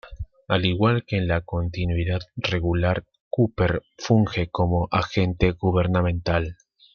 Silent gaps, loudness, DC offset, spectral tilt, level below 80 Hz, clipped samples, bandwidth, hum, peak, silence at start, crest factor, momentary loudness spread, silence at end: 3.20-3.31 s; -23 LUFS; under 0.1%; -7 dB/octave; -40 dBFS; under 0.1%; 6.8 kHz; none; -4 dBFS; 0.05 s; 18 dB; 7 LU; 0.4 s